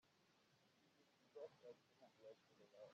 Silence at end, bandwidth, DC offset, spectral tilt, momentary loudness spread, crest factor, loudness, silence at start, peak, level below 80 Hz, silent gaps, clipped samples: 0 s; 7.4 kHz; under 0.1%; -3.5 dB/octave; 7 LU; 20 dB; -64 LUFS; 0.05 s; -46 dBFS; under -90 dBFS; none; under 0.1%